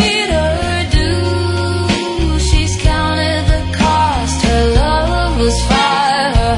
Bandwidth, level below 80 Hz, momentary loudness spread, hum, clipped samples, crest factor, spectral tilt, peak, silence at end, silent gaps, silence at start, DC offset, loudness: 11 kHz; -18 dBFS; 4 LU; none; under 0.1%; 12 dB; -5 dB/octave; 0 dBFS; 0 s; none; 0 s; under 0.1%; -14 LUFS